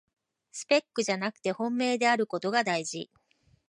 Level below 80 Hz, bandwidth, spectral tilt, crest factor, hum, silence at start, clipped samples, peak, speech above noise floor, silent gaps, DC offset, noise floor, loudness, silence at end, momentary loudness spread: -78 dBFS; 11.5 kHz; -3.5 dB/octave; 20 dB; none; 0.55 s; under 0.1%; -10 dBFS; 39 dB; none; under 0.1%; -67 dBFS; -28 LUFS; 0.65 s; 15 LU